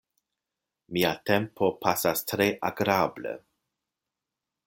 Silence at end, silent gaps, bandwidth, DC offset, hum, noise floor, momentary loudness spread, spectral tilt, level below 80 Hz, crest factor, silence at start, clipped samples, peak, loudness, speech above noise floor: 1.3 s; none; 17 kHz; under 0.1%; none; -88 dBFS; 10 LU; -4.5 dB/octave; -64 dBFS; 22 dB; 0.9 s; under 0.1%; -8 dBFS; -27 LUFS; 61 dB